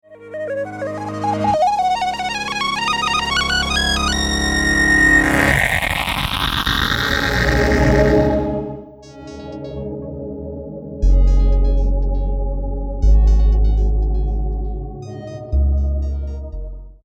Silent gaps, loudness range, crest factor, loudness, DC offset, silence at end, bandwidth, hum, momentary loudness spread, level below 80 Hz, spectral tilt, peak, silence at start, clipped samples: none; 7 LU; 16 dB; -17 LUFS; under 0.1%; 0.1 s; 16 kHz; none; 16 LU; -20 dBFS; -4.5 dB/octave; 0 dBFS; 0.1 s; under 0.1%